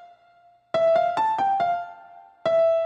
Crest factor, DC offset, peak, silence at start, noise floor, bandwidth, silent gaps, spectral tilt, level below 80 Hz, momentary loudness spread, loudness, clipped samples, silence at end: 12 dB; under 0.1%; -12 dBFS; 0 s; -57 dBFS; 7.8 kHz; none; -5 dB/octave; -68 dBFS; 10 LU; -23 LUFS; under 0.1%; 0 s